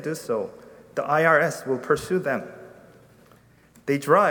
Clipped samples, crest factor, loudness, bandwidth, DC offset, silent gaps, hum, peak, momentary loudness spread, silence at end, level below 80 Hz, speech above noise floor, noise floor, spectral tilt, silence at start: under 0.1%; 20 dB; -23 LUFS; 20 kHz; under 0.1%; none; none; -4 dBFS; 18 LU; 0 s; -62 dBFS; 32 dB; -55 dBFS; -5.5 dB/octave; 0 s